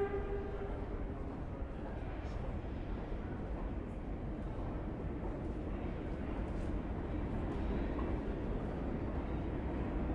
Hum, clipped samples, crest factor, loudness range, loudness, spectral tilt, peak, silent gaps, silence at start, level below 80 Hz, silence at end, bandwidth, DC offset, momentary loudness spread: none; under 0.1%; 12 dB; 3 LU; -41 LUFS; -9 dB/octave; -26 dBFS; none; 0 s; -42 dBFS; 0 s; 6.8 kHz; under 0.1%; 5 LU